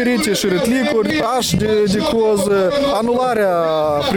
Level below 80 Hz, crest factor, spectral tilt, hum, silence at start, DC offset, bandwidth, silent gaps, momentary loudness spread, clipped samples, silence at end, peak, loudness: -42 dBFS; 14 dB; -4.5 dB/octave; none; 0 s; under 0.1%; 18 kHz; none; 1 LU; under 0.1%; 0 s; -2 dBFS; -16 LUFS